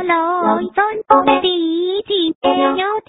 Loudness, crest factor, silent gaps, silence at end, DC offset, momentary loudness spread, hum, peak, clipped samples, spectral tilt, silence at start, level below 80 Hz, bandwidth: -15 LUFS; 16 dB; 2.35-2.41 s; 0.1 s; under 0.1%; 5 LU; none; 0 dBFS; under 0.1%; -1 dB/octave; 0 s; -54 dBFS; 4 kHz